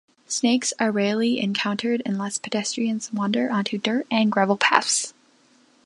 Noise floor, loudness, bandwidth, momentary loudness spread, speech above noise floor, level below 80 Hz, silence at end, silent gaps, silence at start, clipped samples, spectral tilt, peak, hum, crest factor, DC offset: -58 dBFS; -23 LUFS; 11.5 kHz; 7 LU; 36 dB; -74 dBFS; 0.75 s; none; 0.3 s; under 0.1%; -3.5 dB/octave; 0 dBFS; none; 22 dB; under 0.1%